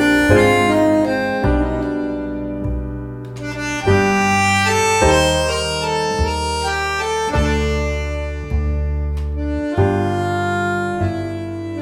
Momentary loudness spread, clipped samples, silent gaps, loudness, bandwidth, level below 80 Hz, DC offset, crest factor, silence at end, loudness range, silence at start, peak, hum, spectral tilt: 11 LU; under 0.1%; none; -18 LUFS; 16 kHz; -26 dBFS; under 0.1%; 16 dB; 0 s; 4 LU; 0 s; 0 dBFS; none; -5 dB/octave